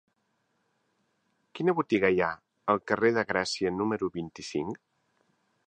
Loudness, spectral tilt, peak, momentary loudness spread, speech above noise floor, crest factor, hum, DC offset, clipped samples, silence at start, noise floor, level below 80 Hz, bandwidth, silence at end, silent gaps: -29 LUFS; -5 dB/octave; -8 dBFS; 11 LU; 48 dB; 22 dB; none; under 0.1%; under 0.1%; 1.55 s; -76 dBFS; -64 dBFS; 9.6 kHz; 0.9 s; none